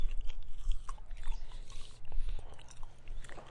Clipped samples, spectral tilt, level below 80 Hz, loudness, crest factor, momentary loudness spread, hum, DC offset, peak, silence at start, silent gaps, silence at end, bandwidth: under 0.1%; -4 dB/octave; -38 dBFS; -48 LUFS; 14 dB; 10 LU; none; under 0.1%; -18 dBFS; 0 s; none; 0 s; 9.2 kHz